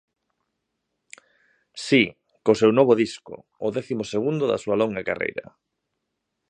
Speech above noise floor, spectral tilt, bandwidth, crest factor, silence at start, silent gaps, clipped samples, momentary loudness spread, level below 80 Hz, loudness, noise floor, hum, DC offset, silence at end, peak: 57 dB; -5.5 dB/octave; 10 kHz; 22 dB; 1.75 s; none; under 0.1%; 17 LU; -64 dBFS; -22 LUFS; -79 dBFS; none; under 0.1%; 1.1 s; -4 dBFS